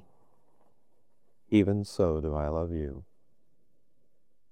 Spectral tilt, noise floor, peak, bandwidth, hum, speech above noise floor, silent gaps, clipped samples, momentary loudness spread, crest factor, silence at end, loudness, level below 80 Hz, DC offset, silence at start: -8 dB/octave; -78 dBFS; -10 dBFS; 11 kHz; none; 50 dB; none; under 0.1%; 12 LU; 22 dB; 1.5 s; -29 LUFS; -48 dBFS; 0.2%; 1.5 s